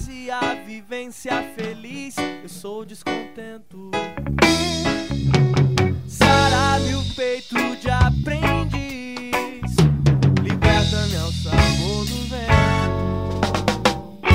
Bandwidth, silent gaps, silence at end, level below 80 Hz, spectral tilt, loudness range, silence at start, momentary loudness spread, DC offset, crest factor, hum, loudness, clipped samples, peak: 16 kHz; none; 0 s; -32 dBFS; -5.5 dB/octave; 10 LU; 0 s; 14 LU; 0.6%; 20 dB; none; -20 LUFS; under 0.1%; 0 dBFS